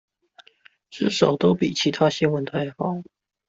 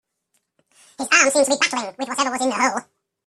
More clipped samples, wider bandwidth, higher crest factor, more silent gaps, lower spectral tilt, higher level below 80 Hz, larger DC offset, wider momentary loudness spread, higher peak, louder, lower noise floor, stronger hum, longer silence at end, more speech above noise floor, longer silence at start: neither; second, 8 kHz vs 14 kHz; about the same, 20 dB vs 22 dB; neither; first, -5.5 dB/octave vs -0.5 dB/octave; first, -60 dBFS vs -68 dBFS; neither; second, 9 LU vs 12 LU; second, -4 dBFS vs 0 dBFS; second, -22 LUFS vs -19 LUFS; second, -56 dBFS vs -71 dBFS; neither; about the same, 0.45 s vs 0.45 s; second, 35 dB vs 52 dB; about the same, 0.9 s vs 1 s